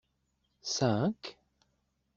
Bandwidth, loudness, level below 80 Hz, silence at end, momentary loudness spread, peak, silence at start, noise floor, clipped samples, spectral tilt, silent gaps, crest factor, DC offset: 7.8 kHz; -31 LUFS; -68 dBFS; 0.85 s; 15 LU; -14 dBFS; 0.65 s; -78 dBFS; under 0.1%; -5 dB/octave; none; 22 dB; under 0.1%